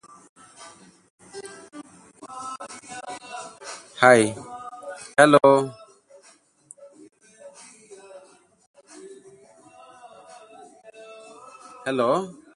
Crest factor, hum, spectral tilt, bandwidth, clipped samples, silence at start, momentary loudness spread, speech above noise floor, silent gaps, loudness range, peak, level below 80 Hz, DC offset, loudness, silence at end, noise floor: 26 dB; none; -4.5 dB/octave; 11.5 kHz; under 0.1%; 1.35 s; 29 LU; 39 dB; 8.67-8.74 s; 19 LU; 0 dBFS; -70 dBFS; under 0.1%; -20 LUFS; 0.25 s; -57 dBFS